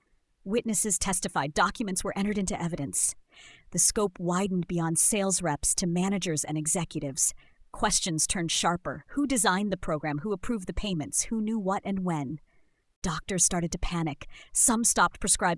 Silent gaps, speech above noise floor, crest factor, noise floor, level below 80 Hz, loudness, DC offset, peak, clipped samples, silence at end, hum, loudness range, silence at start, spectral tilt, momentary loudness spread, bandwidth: 12.96-13.02 s; 26 dB; 20 dB; -54 dBFS; -46 dBFS; -27 LUFS; under 0.1%; -8 dBFS; under 0.1%; 0 s; none; 4 LU; 0.45 s; -3 dB/octave; 10 LU; 12 kHz